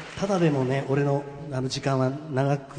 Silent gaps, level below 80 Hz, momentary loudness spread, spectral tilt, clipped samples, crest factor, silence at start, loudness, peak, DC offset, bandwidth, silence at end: none; -58 dBFS; 6 LU; -6.5 dB/octave; under 0.1%; 16 dB; 0 s; -26 LUFS; -10 dBFS; under 0.1%; 10 kHz; 0 s